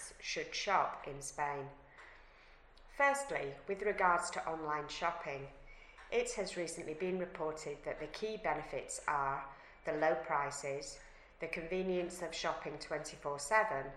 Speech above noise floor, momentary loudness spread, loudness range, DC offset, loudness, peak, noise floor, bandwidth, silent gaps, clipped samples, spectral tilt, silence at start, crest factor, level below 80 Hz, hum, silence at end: 23 dB; 15 LU; 4 LU; under 0.1%; -38 LUFS; -16 dBFS; -61 dBFS; 14.5 kHz; none; under 0.1%; -3.5 dB/octave; 0 s; 22 dB; -62 dBFS; none; 0 s